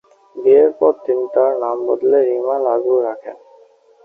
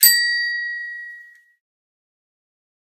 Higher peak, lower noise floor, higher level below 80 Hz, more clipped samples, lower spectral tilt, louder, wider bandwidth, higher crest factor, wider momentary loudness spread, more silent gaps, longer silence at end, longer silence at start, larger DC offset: about the same, -2 dBFS vs 0 dBFS; first, -49 dBFS vs -44 dBFS; first, -66 dBFS vs -84 dBFS; neither; first, -8.5 dB/octave vs 7 dB/octave; first, -16 LUFS vs -19 LUFS; second, 3 kHz vs 15.5 kHz; second, 14 dB vs 24 dB; second, 11 LU vs 21 LU; neither; second, 0.7 s vs 1.7 s; first, 0.35 s vs 0 s; neither